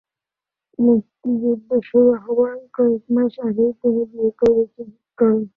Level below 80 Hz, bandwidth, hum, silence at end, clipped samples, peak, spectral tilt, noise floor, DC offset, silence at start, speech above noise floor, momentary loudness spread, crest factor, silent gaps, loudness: -58 dBFS; 4.3 kHz; none; 0.1 s; under 0.1%; -4 dBFS; -9.5 dB/octave; -88 dBFS; under 0.1%; 0.8 s; 70 dB; 7 LU; 14 dB; none; -19 LUFS